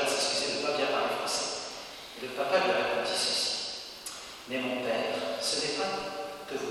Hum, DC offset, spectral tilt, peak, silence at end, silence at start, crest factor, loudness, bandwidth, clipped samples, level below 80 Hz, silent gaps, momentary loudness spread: none; under 0.1%; -1.5 dB/octave; -14 dBFS; 0 s; 0 s; 18 dB; -30 LUFS; 16.5 kHz; under 0.1%; -68 dBFS; none; 12 LU